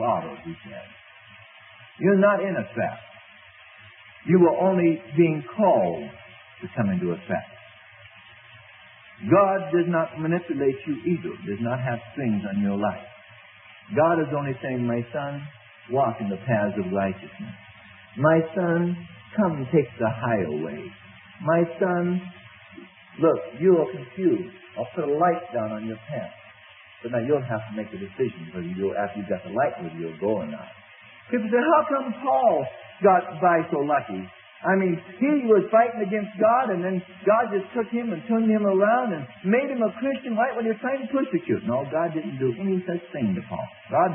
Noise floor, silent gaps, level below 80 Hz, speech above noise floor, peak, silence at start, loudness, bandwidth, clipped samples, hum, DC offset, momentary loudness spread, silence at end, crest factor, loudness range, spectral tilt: -49 dBFS; none; -66 dBFS; 26 dB; -6 dBFS; 0 s; -24 LUFS; 3.7 kHz; under 0.1%; none; under 0.1%; 15 LU; 0 s; 18 dB; 6 LU; -12 dB/octave